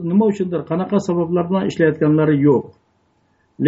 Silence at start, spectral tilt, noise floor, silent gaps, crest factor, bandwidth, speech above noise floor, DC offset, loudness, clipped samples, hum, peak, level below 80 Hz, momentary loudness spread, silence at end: 0 s; -8 dB/octave; -61 dBFS; none; 14 dB; 8 kHz; 45 dB; under 0.1%; -17 LUFS; under 0.1%; none; -2 dBFS; -58 dBFS; 6 LU; 0 s